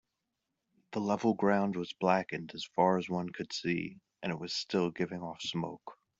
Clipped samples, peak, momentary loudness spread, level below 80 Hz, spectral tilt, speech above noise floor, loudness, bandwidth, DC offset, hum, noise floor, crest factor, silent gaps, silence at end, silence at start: under 0.1%; -12 dBFS; 11 LU; -72 dBFS; -5.5 dB/octave; 53 dB; -33 LUFS; 7.8 kHz; under 0.1%; none; -86 dBFS; 20 dB; none; 0.25 s; 0.9 s